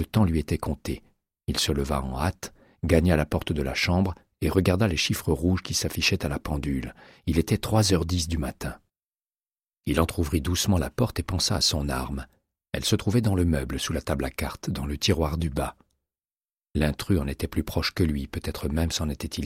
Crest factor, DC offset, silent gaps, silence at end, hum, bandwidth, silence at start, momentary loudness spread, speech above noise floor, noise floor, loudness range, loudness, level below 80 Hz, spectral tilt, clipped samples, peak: 22 dB; under 0.1%; 9.06-9.12 s, 9.73-9.81 s, 16.37-16.41 s; 0 s; none; 16 kHz; 0 s; 10 LU; over 65 dB; under -90 dBFS; 4 LU; -26 LUFS; -36 dBFS; -5 dB/octave; under 0.1%; -4 dBFS